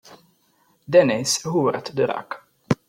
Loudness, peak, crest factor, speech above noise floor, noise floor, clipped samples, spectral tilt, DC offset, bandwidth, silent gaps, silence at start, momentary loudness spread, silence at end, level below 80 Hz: -21 LUFS; -4 dBFS; 20 dB; 43 dB; -63 dBFS; under 0.1%; -4.5 dB/octave; under 0.1%; 16 kHz; none; 0.1 s; 15 LU; 0.15 s; -62 dBFS